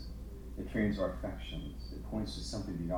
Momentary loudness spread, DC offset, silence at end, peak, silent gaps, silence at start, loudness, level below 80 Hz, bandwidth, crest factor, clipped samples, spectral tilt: 13 LU; under 0.1%; 0 s; -20 dBFS; none; 0 s; -39 LUFS; -44 dBFS; 19.5 kHz; 18 dB; under 0.1%; -6 dB/octave